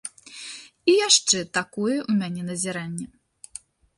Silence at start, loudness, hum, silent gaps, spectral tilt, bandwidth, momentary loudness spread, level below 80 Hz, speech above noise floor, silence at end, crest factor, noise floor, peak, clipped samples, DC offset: 0.05 s; -22 LUFS; none; none; -2.5 dB/octave; 11.5 kHz; 24 LU; -66 dBFS; 23 dB; 0.9 s; 22 dB; -46 dBFS; -4 dBFS; under 0.1%; under 0.1%